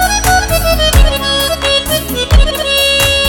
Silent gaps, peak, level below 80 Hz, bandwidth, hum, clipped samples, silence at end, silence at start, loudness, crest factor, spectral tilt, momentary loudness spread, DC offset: none; 0 dBFS; -14 dBFS; over 20 kHz; none; under 0.1%; 0 s; 0 s; -11 LUFS; 10 dB; -3 dB/octave; 3 LU; under 0.1%